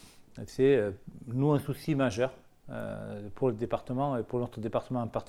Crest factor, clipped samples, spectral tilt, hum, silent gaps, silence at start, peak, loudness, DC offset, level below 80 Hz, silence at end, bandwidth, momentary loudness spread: 18 dB; under 0.1%; -7.5 dB/octave; none; none; 0.05 s; -14 dBFS; -31 LUFS; under 0.1%; -56 dBFS; 0 s; 14.5 kHz; 15 LU